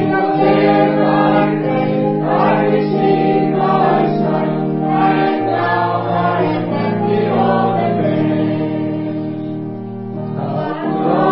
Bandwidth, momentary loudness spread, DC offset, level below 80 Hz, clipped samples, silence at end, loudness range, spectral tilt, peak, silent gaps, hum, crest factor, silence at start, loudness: 5.8 kHz; 9 LU; 0.7%; -56 dBFS; under 0.1%; 0 s; 4 LU; -12 dB/octave; 0 dBFS; none; none; 14 dB; 0 s; -15 LUFS